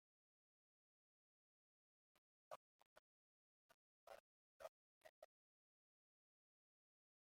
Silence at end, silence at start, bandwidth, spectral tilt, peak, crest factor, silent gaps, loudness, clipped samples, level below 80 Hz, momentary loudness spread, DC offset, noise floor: 2.05 s; 2.15 s; 15 kHz; -2 dB/octave; -42 dBFS; 30 dB; 2.18-4.07 s, 4.20-4.60 s, 4.68-5.01 s, 5.09-5.22 s; -65 LUFS; under 0.1%; under -90 dBFS; 6 LU; under 0.1%; under -90 dBFS